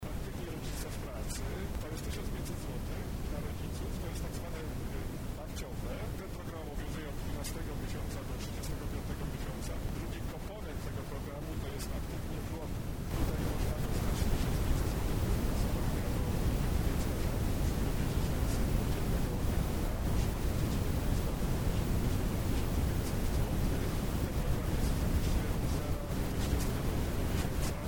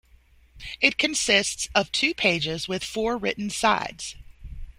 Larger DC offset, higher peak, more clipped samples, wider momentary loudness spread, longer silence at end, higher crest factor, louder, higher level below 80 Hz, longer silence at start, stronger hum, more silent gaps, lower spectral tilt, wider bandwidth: first, 0.2% vs under 0.1%; second, -18 dBFS vs -2 dBFS; neither; second, 7 LU vs 14 LU; about the same, 0 s vs 0.1 s; second, 16 dB vs 24 dB; second, -36 LUFS vs -23 LUFS; first, -36 dBFS vs -48 dBFS; second, 0 s vs 0.55 s; neither; neither; first, -6 dB/octave vs -2 dB/octave; first, over 20 kHz vs 16 kHz